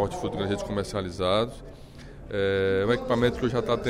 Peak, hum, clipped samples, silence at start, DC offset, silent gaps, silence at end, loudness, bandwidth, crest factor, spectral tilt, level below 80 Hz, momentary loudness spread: -10 dBFS; none; under 0.1%; 0 s; under 0.1%; none; 0 s; -27 LUFS; 14 kHz; 16 dB; -6 dB/octave; -46 dBFS; 21 LU